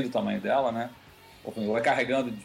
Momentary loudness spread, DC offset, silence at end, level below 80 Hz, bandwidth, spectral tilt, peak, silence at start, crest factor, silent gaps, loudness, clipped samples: 14 LU; under 0.1%; 0 s; -64 dBFS; 16 kHz; -5.5 dB/octave; -12 dBFS; 0 s; 16 dB; none; -27 LUFS; under 0.1%